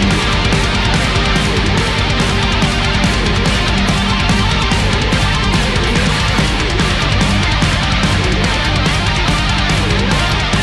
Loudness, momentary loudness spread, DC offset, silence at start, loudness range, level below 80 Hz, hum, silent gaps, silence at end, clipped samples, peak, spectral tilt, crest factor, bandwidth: -13 LUFS; 1 LU; under 0.1%; 0 s; 0 LU; -20 dBFS; none; none; 0 s; under 0.1%; -2 dBFS; -4.5 dB/octave; 12 dB; 12 kHz